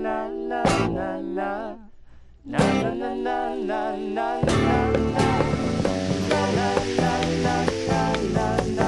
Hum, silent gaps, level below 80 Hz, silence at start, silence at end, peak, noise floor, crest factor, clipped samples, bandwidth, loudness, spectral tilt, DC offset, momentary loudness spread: none; none; -40 dBFS; 0 s; 0 s; -4 dBFS; -46 dBFS; 18 dB; under 0.1%; 12 kHz; -24 LUFS; -6 dB/octave; under 0.1%; 7 LU